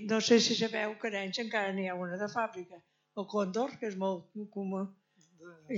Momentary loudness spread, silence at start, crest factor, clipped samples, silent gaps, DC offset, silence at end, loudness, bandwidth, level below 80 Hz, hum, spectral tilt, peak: 17 LU; 0 s; 22 dB; under 0.1%; none; under 0.1%; 0 s; -33 LUFS; 7.8 kHz; -88 dBFS; none; -4 dB/octave; -12 dBFS